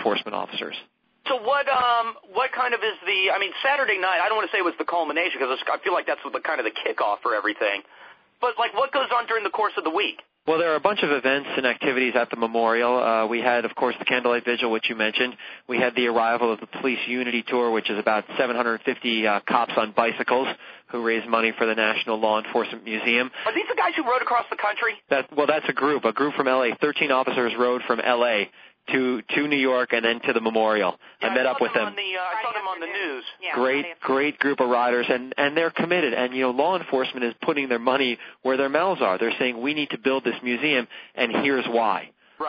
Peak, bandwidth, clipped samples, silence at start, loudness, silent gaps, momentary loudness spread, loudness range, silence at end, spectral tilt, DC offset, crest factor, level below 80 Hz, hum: -4 dBFS; 5.4 kHz; under 0.1%; 0 s; -23 LUFS; none; 6 LU; 2 LU; 0 s; -6 dB/octave; under 0.1%; 20 dB; -72 dBFS; none